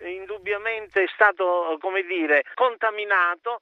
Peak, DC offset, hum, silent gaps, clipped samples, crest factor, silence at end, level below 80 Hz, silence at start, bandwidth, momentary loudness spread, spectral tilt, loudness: -4 dBFS; under 0.1%; none; none; under 0.1%; 20 dB; 0.05 s; -70 dBFS; 0 s; 6.4 kHz; 8 LU; -4.5 dB/octave; -22 LUFS